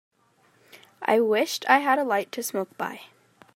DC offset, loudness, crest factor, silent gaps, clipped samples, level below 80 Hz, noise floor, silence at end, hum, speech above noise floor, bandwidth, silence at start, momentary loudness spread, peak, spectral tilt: under 0.1%; -24 LUFS; 22 dB; none; under 0.1%; -84 dBFS; -63 dBFS; 0.5 s; none; 39 dB; 16.5 kHz; 0.75 s; 13 LU; -4 dBFS; -3 dB/octave